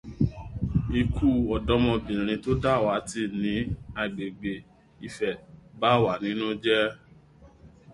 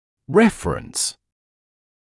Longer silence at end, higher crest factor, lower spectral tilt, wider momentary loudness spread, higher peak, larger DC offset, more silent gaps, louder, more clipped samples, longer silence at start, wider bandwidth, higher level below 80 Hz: second, 0 s vs 1.05 s; about the same, 20 dB vs 20 dB; first, -6.5 dB/octave vs -4 dB/octave; about the same, 10 LU vs 9 LU; about the same, -6 dBFS vs -4 dBFS; neither; neither; second, -27 LUFS vs -20 LUFS; neither; second, 0.05 s vs 0.3 s; about the same, 11.5 kHz vs 12 kHz; first, -40 dBFS vs -46 dBFS